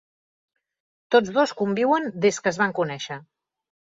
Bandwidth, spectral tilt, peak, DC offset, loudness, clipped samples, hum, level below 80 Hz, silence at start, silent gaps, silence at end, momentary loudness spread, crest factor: 7.8 kHz; -4.5 dB/octave; -6 dBFS; under 0.1%; -23 LUFS; under 0.1%; none; -68 dBFS; 1.1 s; none; 0.75 s; 11 LU; 20 dB